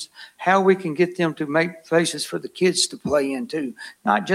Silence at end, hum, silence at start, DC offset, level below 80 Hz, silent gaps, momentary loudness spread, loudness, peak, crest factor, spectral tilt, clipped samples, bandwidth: 0 s; none; 0 s; under 0.1%; -62 dBFS; none; 10 LU; -22 LUFS; -4 dBFS; 18 dB; -4 dB/octave; under 0.1%; 15.5 kHz